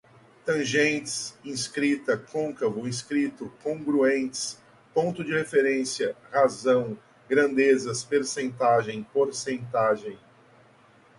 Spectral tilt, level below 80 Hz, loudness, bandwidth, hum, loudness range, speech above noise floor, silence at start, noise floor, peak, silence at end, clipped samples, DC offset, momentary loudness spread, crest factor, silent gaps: -4 dB/octave; -68 dBFS; -26 LUFS; 11.5 kHz; none; 3 LU; 31 dB; 0.45 s; -57 dBFS; -8 dBFS; 1.05 s; under 0.1%; under 0.1%; 10 LU; 18 dB; none